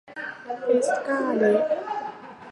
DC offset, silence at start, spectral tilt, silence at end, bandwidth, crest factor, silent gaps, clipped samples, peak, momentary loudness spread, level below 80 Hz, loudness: under 0.1%; 0.1 s; -5 dB/octave; 0 s; 11.5 kHz; 16 dB; none; under 0.1%; -8 dBFS; 14 LU; -74 dBFS; -24 LUFS